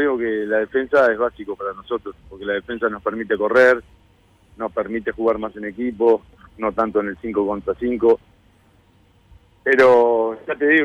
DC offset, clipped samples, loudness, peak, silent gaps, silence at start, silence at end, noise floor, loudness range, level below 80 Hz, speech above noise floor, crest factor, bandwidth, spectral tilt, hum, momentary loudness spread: under 0.1%; under 0.1%; -20 LUFS; -6 dBFS; none; 0 s; 0 s; -55 dBFS; 4 LU; -52 dBFS; 36 dB; 14 dB; 9 kHz; -6 dB/octave; none; 13 LU